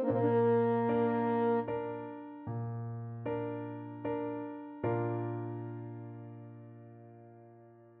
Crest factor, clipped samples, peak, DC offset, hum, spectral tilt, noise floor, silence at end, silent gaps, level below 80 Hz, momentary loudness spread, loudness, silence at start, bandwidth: 14 dB; under 0.1%; -20 dBFS; under 0.1%; none; -8.5 dB/octave; -57 dBFS; 0.05 s; none; -72 dBFS; 22 LU; -34 LUFS; 0 s; 4 kHz